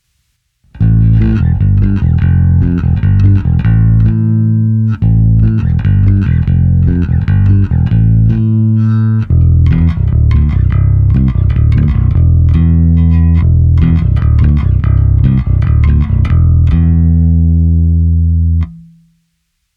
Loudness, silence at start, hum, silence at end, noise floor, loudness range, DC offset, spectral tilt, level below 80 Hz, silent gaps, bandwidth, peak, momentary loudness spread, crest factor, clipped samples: -10 LUFS; 0.75 s; none; 0.95 s; -64 dBFS; 1 LU; under 0.1%; -11 dB/octave; -14 dBFS; none; 3.9 kHz; 0 dBFS; 2 LU; 8 dB; under 0.1%